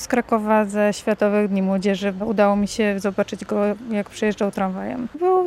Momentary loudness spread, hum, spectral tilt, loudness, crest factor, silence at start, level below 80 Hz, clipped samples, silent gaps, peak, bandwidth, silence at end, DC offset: 7 LU; none; -6 dB/octave; -21 LUFS; 14 dB; 0 s; -52 dBFS; under 0.1%; none; -6 dBFS; 13 kHz; 0 s; under 0.1%